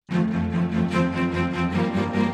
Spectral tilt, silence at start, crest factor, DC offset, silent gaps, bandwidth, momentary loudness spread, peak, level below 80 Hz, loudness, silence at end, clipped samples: -7.5 dB/octave; 0.1 s; 14 dB; under 0.1%; none; 9.2 kHz; 2 LU; -10 dBFS; -46 dBFS; -24 LUFS; 0 s; under 0.1%